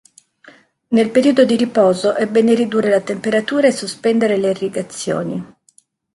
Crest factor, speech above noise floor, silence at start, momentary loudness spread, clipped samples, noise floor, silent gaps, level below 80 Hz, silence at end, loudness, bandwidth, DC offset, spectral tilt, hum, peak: 16 dB; 40 dB; 0.9 s; 9 LU; under 0.1%; -55 dBFS; none; -62 dBFS; 0.7 s; -16 LUFS; 11.5 kHz; under 0.1%; -5 dB/octave; none; 0 dBFS